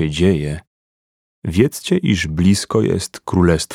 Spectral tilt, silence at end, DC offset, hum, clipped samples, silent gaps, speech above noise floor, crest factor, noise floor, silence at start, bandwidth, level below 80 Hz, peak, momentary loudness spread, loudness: -6 dB/octave; 0 s; 0.1%; none; under 0.1%; 0.67-1.42 s; over 74 dB; 18 dB; under -90 dBFS; 0 s; 16 kHz; -36 dBFS; 0 dBFS; 8 LU; -17 LUFS